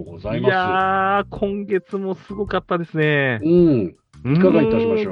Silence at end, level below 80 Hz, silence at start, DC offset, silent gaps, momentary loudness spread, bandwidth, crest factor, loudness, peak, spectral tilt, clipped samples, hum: 0 s; -46 dBFS; 0 s; under 0.1%; none; 12 LU; 6 kHz; 16 dB; -19 LUFS; -2 dBFS; -9 dB/octave; under 0.1%; none